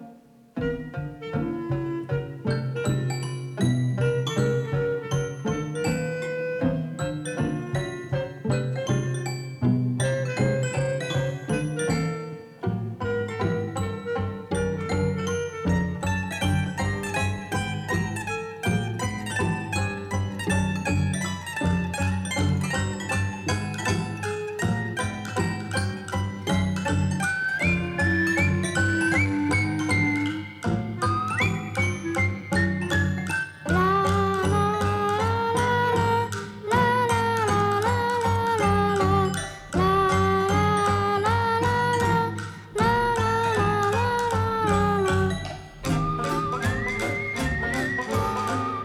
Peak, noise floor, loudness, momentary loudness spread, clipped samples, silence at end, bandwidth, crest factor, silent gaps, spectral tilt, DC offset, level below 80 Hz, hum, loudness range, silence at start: -8 dBFS; -50 dBFS; -25 LUFS; 8 LU; under 0.1%; 0 s; 14.5 kHz; 18 dB; none; -5.5 dB/octave; under 0.1%; -44 dBFS; none; 5 LU; 0 s